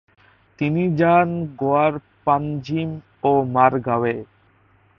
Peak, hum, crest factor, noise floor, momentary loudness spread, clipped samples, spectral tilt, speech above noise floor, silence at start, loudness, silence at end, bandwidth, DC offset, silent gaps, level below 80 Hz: 0 dBFS; none; 20 dB; -57 dBFS; 10 LU; under 0.1%; -9.5 dB/octave; 38 dB; 0.6 s; -20 LUFS; 0.75 s; 6.6 kHz; under 0.1%; none; -56 dBFS